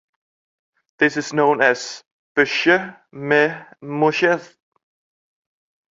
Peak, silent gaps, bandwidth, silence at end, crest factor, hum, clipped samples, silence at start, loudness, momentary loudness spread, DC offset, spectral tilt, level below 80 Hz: -2 dBFS; 2.06-2.35 s; 7.8 kHz; 1.45 s; 20 dB; none; under 0.1%; 1 s; -18 LUFS; 16 LU; under 0.1%; -4.5 dB/octave; -68 dBFS